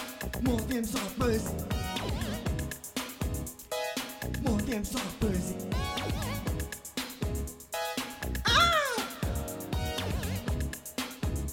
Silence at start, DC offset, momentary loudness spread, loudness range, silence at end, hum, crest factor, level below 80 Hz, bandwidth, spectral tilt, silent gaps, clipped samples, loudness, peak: 0 s; under 0.1%; 8 LU; 4 LU; 0 s; none; 20 dB; -40 dBFS; 17.5 kHz; -4.5 dB/octave; none; under 0.1%; -32 LUFS; -12 dBFS